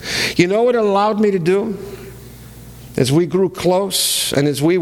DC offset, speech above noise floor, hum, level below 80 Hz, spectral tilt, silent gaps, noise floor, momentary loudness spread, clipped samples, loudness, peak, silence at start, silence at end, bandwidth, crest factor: under 0.1%; 21 dB; none; -46 dBFS; -4.5 dB/octave; none; -37 dBFS; 14 LU; under 0.1%; -16 LUFS; 0 dBFS; 0 s; 0 s; 19.5 kHz; 16 dB